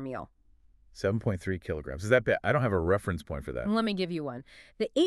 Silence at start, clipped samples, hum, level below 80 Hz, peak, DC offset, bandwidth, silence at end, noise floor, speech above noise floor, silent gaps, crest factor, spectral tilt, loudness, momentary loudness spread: 0 s; under 0.1%; none; -50 dBFS; -10 dBFS; under 0.1%; 12.5 kHz; 0 s; -62 dBFS; 32 dB; none; 20 dB; -6.5 dB/octave; -30 LUFS; 13 LU